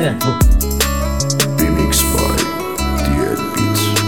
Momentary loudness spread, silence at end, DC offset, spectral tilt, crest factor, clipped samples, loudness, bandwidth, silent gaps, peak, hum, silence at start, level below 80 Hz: 5 LU; 0 s; 1%; -4 dB/octave; 14 dB; under 0.1%; -16 LUFS; 18 kHz; none; 0 dBFS; none; 0 s; -20 dBFS